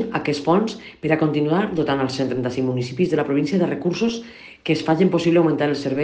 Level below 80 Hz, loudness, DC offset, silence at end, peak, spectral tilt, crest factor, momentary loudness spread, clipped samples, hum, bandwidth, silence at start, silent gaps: -56 dBFS; -21 LUFS; under 0.1%; 0 s; -4 dBFS; -6.5 dB/octave; 16 dB; 7 LU; under 0.1%; none; 9 kHz; 0 s; none